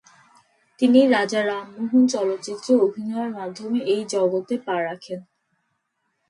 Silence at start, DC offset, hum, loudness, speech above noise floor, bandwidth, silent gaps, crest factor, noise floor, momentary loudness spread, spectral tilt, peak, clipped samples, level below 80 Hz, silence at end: 0.8 s; under 0.1%; none; -22 LUFS; 53 dB; 11 kHz; none; 18 dB; -74 dBFS; 13 LU; -4.5 dB/octave; -4 dBFS; under 0.1%; -76 dBFS; 1.1 s